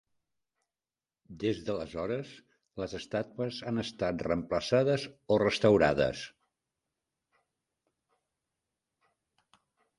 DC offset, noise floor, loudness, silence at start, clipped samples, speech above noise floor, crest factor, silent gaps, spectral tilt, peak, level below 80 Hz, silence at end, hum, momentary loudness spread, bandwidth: under 0.1%; under -90 dBFS; -31 LUFS; 1.3 s; under 0.1%; over 60 dB; 24 dB; none; -6 dB/octave; -10 dBFS; -58 dBFS; 3.7 s; none; 14 LU; 11.5 kHz